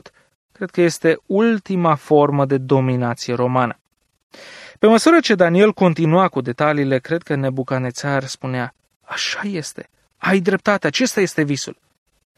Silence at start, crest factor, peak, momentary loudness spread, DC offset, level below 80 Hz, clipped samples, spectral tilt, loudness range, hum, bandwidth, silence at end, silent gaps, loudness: 0.6 s; 16 dB; -2 dBFS; 12 LU; under 0.1%; -62 dBFS; under 0.1%; -5.5 dB/octave; 6 LU; none; 14 kHz; 0.65 s; 3.81-3.85 s, 4.23-4.30 s, 8.96-9.00 s; -18 LUFS